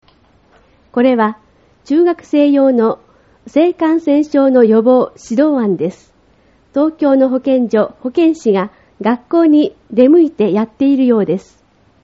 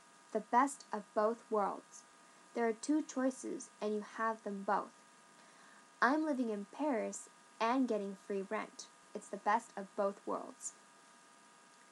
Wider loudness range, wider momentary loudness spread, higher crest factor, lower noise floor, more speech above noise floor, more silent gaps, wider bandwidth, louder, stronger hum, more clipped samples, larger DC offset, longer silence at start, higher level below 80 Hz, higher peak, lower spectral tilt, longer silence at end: about the same, 3 LU vs 4 LU; second, 8 LU vs 15 LU; second, 14 dB vs 22 dB; second, -51 dBFS vs -63 dBFS; first, 39 dB vs 25 dB; neither; second, 7.8 kHz vs 12 kHz; first, -13 LUFS vs -38 LUFS; neither; neither; neither; first, 0.95 s vs 0.3 s; first, -56 dBFS vs under -90 dBFS; first, 0 dBFS vs -16 dBFS; first, -6 dB/octave vs -4.5 dB/octave; second, 0.65 s vs 1.2 s